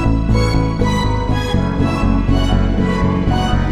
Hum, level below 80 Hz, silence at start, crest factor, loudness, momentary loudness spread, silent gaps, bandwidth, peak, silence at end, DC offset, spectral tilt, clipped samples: none; -20 dBFS; 0 s; 12 dB; -16 LUFS; 2 LU; none; 11.5 kHz; -2 dBFS; 0 s; under 0.1%; -7 dB/octave; under 0.1%